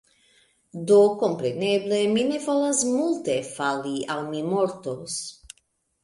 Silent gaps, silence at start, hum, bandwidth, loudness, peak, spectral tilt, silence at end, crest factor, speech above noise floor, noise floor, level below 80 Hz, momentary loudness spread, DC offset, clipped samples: none; 0.75 s; none; 11.5 kHz; -24 LUFS; -8 dBFS; -4 dB/octave; 0.7 s; 16 dB; 46 dB; -69 dBFS; -66 dBFS; 13 LU; under 0.1%; under 0.1%